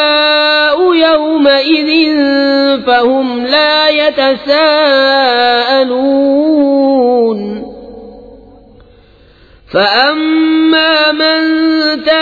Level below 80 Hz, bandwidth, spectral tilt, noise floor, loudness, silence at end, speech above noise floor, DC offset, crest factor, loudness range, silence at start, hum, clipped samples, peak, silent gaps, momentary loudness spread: -48 dBFS; 5 kHz; -5 dB/octave; -42 dBFS; -9 LUFS; 0 s; 33 dB; under 0.1%; 10 dB; 6 LU; 0 s; none; under 0.1%; 0 dBFS; none; 4 LU